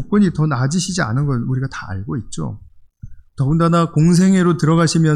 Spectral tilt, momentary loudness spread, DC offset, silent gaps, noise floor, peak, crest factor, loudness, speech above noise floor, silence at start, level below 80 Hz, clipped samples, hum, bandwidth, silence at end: -6.5 dB/octave; 13 LU; under 0.1%; none; -36 dBFS; -4 dBFS; 12 dB; -17 LUFS; 21 dB; 0 s; -40 dBFS; under 0.1%; none; 11 kHz; 0 s